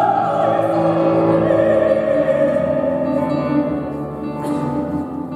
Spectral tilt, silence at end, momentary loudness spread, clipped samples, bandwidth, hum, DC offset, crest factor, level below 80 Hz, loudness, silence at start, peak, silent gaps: -8.5 dB/octave; 0 s; 9 LU; under 0.1%; 11.5 kHz; none; under 0.1%; 14 dB; -48 dBFS; -18 LUFS; 0 s; -4 dBFS; none